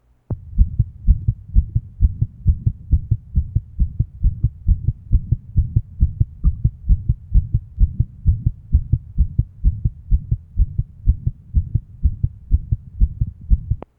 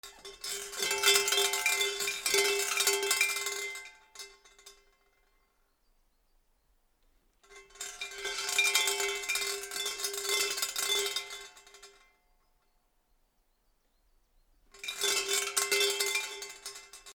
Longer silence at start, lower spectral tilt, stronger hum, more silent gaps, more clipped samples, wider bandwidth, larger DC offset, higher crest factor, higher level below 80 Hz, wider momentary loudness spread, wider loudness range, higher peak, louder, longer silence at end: first, 0.3 s vs 0.05 s; first, -14 dB/octave vs 2 dB/octave; neither; neither; neither; second, 1.2 kHz vs over 20 kHz; neither; second, 18 dB vs 26 dB; first, -20 dBFS vs -68 dBFS; second, 4 LU vs 18 LU; second, 2 LU vs 16 LU; first, 0 dBFS vs -8 dBFS; first, -22 LUFS vs -29 LUFS; first, 0.2 s vs 0.05 s